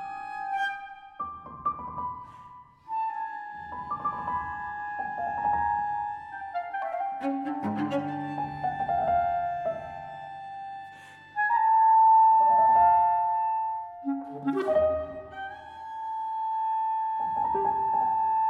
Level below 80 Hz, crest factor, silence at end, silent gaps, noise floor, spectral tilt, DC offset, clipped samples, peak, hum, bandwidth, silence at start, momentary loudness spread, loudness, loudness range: -58 dBFS; 16 dB; 0 s; none; -50 dBFS; -7 dB/octave; under 0.1%; under 0.1%; -12 dBFS; none; 5 kHz; 0 s; 19 LU; -27 LUFS; 12 LU